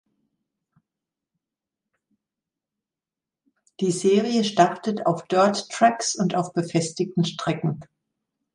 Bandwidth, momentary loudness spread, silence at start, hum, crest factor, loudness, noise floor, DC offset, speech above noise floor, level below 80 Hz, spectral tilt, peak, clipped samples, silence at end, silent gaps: 11.5 kHz; 6 LU; 3.8 s; none; 22 dB; -23 LUFS; -89 dBFS; under 0.1%; 67 dB; -70 dBFS; -5 dB/octave; -4 dBFS; under 0.1%; 0.7 s; none